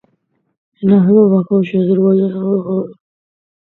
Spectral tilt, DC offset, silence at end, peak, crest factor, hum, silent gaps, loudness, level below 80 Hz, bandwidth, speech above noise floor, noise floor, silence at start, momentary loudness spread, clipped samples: -12 dB/octave; under 0.1%; 0.7 s; 0 dBFS; 14 dB; none; none; -13 LUFS; -60 dBFS; 4 kHz; 52 dB; -64 dBFS; 0.8 s; 10 LU; under 0.1%